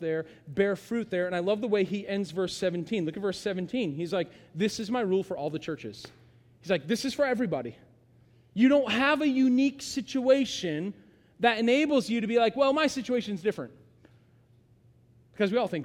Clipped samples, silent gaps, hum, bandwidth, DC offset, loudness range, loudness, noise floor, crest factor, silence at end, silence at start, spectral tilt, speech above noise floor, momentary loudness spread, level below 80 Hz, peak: under 0.1%; none; none; 14.5 kHz; under 0.1%; 6 LU; -28 LUFS; -61 dBFS; 18 dB; 0 s; 0 s; -5 dB/octave; 33 dB; 12 LU; -66 dBFS; -10 dBFS